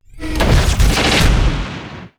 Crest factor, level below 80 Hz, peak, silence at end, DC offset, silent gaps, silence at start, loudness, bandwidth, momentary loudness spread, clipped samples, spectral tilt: 10 dB; -16 dBFS; -6 dBFS; 0.1 s; under 0.1%; none; 0.15 s; -15 LUFS; over 20 kHz; 13 LU; under 0.1%; -4.5 dB/octave